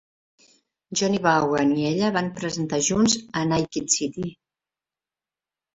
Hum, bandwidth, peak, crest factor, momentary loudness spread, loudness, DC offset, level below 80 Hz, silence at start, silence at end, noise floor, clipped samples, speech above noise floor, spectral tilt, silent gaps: none; 8.2 kHz; -4 dBFS; 20 dB; 8 LU; -23 LUFS; under 0.1%; -56 dBFS; 0.9 s; 1.45 s; under -90 dBFS; under 0.1%; over 67 dB; -4 dB/octave; none